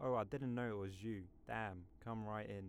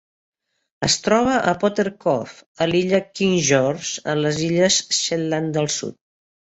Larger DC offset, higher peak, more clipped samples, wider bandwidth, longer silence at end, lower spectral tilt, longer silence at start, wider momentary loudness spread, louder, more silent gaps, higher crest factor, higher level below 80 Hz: neither; second, -28 dBFS vs -2 dBFS; neither; first, 14 kHz vs 8.4 kHz; second, 0 s vs 0.6 s; first, -7.5 dB/octave vs -3.5 dB/octave; second, 0 s vs 0.8 s; about the same, 8 LU vs 8 LU; second, -46 LUFS vs -20 LUFS; second, none vs 2.46-2.55 s; about the same, 16 dB vs 18 dB; second, -68 dBFS vs -54 dBFS